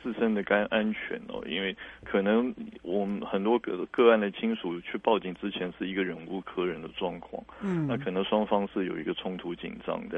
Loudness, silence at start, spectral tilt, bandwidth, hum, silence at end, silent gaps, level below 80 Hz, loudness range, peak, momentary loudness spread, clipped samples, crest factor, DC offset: -30 LUFS; 0 s; -8 dB/octave; 4 kHz; none; 0 s; none; -62 dBFS; 4 LU; -8 dBFS; 11 LU; under 0.1%; 22 dB; under 0.1%